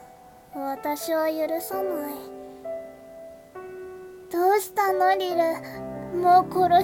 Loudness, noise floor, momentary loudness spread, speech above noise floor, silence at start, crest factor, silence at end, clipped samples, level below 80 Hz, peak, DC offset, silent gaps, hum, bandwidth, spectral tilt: -24 LUFS; -49 dBFS; 22 LU; 26 dB; 0 s; 18 dB; 0 s; under 0.1%; -60 dBFS; -8 dBFS; under 0.1%; none; none; 17.5 kHz; -4.5 dB/octave